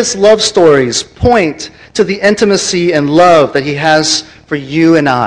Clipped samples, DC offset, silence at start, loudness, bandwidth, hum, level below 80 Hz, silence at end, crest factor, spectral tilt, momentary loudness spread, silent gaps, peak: 2%; under 0.1%; 0 s; -9 LUFS; 11 kHz; none; -36 dBFS; 0 s; 10 dB; -4 dB/octave; 9 LU; none; 0 dBFS